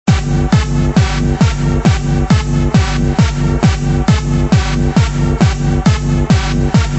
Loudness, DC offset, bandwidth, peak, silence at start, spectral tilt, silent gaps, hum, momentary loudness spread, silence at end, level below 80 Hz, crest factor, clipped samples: -13 LUFS; under 0.1%; 8.4 kHz; 0 dBFS; 0.05 s; -6.5 dB/octave; none; none; 1 LU; 0 s; -18 dBFS; 12 dB; under 0.1%